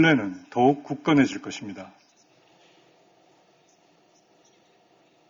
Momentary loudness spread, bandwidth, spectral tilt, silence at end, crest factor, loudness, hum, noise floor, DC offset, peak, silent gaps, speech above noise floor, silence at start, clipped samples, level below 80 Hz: 19 LU; 7.6 kHz; -6 dB/octave; 3.45 s; 20 dB; -24 LUFS; none; -61 dBFS; under 0.1%; -8 dBFS; none; 38 dB; 0 s; under 0.1%; -66 dBFS